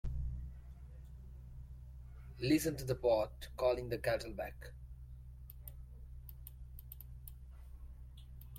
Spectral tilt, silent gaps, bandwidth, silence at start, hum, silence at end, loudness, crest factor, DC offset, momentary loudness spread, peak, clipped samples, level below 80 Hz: -6 dB/octave; none; 16.5 kHz; 0.05 s; none; 0 s; -37 LUFS; 20 dB; under 0.1%; 21 LU; -20 dBFS; under 0.1%; -50 dBFS